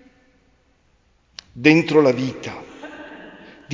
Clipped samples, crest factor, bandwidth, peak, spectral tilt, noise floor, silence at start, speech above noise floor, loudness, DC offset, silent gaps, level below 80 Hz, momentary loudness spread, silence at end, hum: under 0.1%; 22 dB; 7.6 kHz; 0 dBFS; -6 dB/octave; -60 dBFS; 1.55 s; 43 dB; -17 LUFS; under 0.1%; none; -58 dBFS; 27 LU; 0 s; none